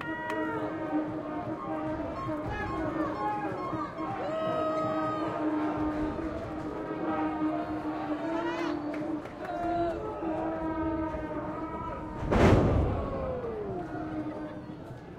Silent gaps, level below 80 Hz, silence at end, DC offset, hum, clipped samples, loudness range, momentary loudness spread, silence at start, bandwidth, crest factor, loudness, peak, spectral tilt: none; -44 dBFS; 0 s; under 0.1%; none; under 0.1%; 4 LU; 7 LU; 0 s; 9.8 kHz; 22 dB; -32 LUFS; -8 dBFS; -8 dB/octave